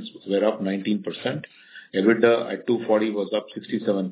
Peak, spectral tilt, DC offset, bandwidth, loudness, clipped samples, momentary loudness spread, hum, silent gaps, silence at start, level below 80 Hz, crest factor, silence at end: -4 dBFS; -10.5 dB/octave; under 0.1%; 4 kHz; -24 LUFS; under 0.1%; 10 LU; none; none; 0 s; -76 dBFS; 20 dB; 0 s